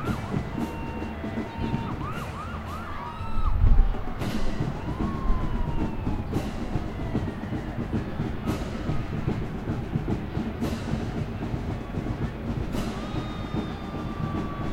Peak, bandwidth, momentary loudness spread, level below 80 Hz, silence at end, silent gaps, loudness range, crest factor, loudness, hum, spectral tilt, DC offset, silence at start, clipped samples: -6 dBFS; 13.5 kHz; 4 LU; -30 dBFS; 0 s; none; 3 LU; 20 dB; -31 LUFS; none; -7.5 dB/octave; under 0.1%; 0 s; under 0.1%